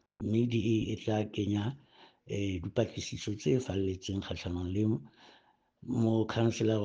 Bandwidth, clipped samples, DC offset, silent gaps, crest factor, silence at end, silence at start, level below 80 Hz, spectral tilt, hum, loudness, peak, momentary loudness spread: 7.8 kHz; under 0.1%; under 0.1%; none; 18 dB; 0 s; 0.2 s; -58 dBFS; -6.5 dB/octave; none; -33 LUFS; -14 dBFS; 8 LU